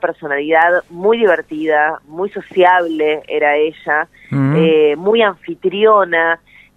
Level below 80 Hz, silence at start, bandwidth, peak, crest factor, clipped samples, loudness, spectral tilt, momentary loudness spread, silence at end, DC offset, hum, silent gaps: -58 dBFS; 0.05 s; 4.1 kHz; 0 dBFS; 14 dB; under 0.1%; -14 LUFS; -7.5 dB/octave; 9 LU; 0.4 s; under 0.1%; none; none